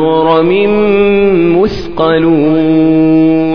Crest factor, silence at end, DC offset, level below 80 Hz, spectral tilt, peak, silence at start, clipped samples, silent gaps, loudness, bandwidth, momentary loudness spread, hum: 8 dB; 0 s; 3%; -34 dBFS; -8.5 dB/octave; 0 dBFS; 0 s; 0.1%; none; -9 LUFS; 5.4 kHz; 4 LU; none